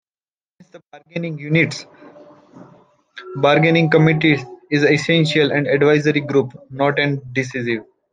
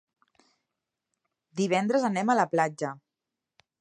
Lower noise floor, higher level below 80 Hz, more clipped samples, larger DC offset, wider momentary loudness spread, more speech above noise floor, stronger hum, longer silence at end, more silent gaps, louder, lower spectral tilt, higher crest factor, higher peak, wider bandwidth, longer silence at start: about the same, under -90 dBFS vs -87 dBFS; first, -60 dBFS vs -82 dBFS; neither; neither; about the same, 13 LU vs 13 LU; first, over 73 dB vs 62 dB; neither; second, 0.3 s vs 0.85 s; neither; first, -17 LUFS vs -27 LUFS; about the same, -6.5 dB/octave vs -5.5 dB/octave; about the same, 18 dB vs 20 dB; first, -2 dBFS vs -10 dBFS; second, 9.4 kHz vs 11 kHz; second, 0.75 s vs 1.55 s